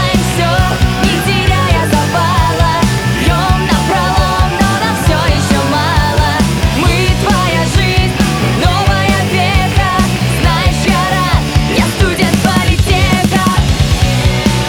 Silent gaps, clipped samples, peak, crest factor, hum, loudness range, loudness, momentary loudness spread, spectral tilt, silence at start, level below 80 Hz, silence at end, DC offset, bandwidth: none; under 0.1%; 0 dBFS; 10 dB; none; 0 LU; -11 LUFS; 1 LU; -5 dB/octave; 0 s; -18 dBFS; 0 s; under 0.1%; over 20 kHz